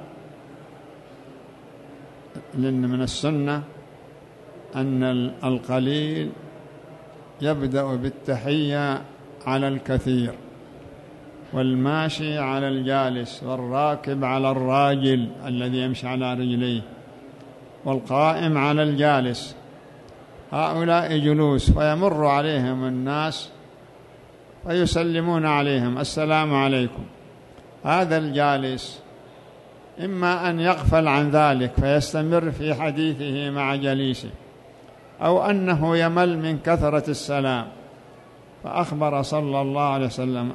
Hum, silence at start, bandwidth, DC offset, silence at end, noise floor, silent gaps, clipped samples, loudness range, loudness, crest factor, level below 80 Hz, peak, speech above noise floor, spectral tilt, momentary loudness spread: none; 0 s; 12 kHz; under 0.1%; 0 s; -47 dBFS; none; under 0.1%; 5 LU; -23 LUFS; 20 dB; -40 dBFS; -4 dBFS; 25 dB; -6.5 dB/octave; 19 LU